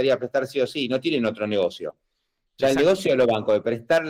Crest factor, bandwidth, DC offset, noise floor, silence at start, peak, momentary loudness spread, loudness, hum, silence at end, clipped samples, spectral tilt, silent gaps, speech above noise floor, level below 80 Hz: 12 dB; 15.5 kHz; under 0.1%; -76 dBFS; 0 s; -12 dBFS; 6 LU; -22 LUFS; none; 0 s; under 0.1%; -5 dB/octave; none; 54 dB; -60 dBFS